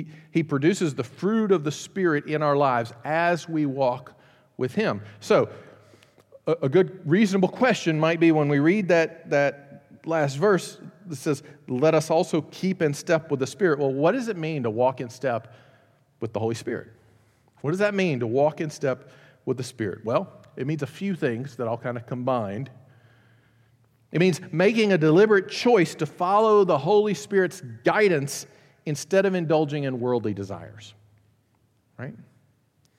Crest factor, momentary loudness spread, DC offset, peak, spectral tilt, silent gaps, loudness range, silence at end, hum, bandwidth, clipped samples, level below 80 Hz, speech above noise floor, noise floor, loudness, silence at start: 18 dB; 13 LU; under 0.1%; -8 dBFS; -6 dB/octave; none; 8 LU; 0.8 s; none; 15 kHz; under 0.1%; -74 dBFS; 42 dB; -66 dBFS; -24 LUFS; 0 s